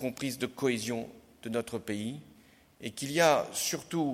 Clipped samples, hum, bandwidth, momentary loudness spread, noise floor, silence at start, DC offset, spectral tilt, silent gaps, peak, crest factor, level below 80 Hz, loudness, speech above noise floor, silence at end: under 0.1%; none; 16.5 kHz; 17 LU; -59 dBFS; 0 s; under 0.1%; -3.5 dB/octave; none; -12 dBFS; 20 dB; -68 dBFS; -32 LUFS; 28 dB; 0 s